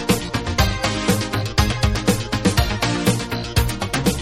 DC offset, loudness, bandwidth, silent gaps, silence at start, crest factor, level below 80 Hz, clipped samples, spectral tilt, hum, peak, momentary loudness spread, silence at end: under 0.1%; -20 LUFS; 16 kHz; none; 0 s; 18 dB; -28 dBFS; under 0.1%; -4.5 dB/octave; none; -2 dBFS; 3 LU; 0 s